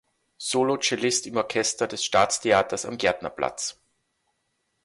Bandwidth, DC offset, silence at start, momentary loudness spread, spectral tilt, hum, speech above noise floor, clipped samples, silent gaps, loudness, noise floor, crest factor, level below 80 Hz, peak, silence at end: 11.5 kHz; under 0.1%; 0.4 s; 8 LU; -2.5 dB/octave; none; 50 dB; under 0.1%; none; -24 LUFS; -75 dBFS; 18 dB; -60 dBFS; -8 dBFS; 1.1 s